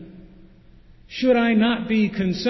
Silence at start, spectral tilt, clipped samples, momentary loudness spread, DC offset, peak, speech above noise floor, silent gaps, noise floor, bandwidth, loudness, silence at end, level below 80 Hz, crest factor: 0 s; -6.5 dB/octave; under 0.1%; 6 LU; under 0.1%; -8 dBFS; 29 dB; none; -49 dBFS; 6 kHz; -20 LUFS; 0 s; -50 dBFS; 14 dB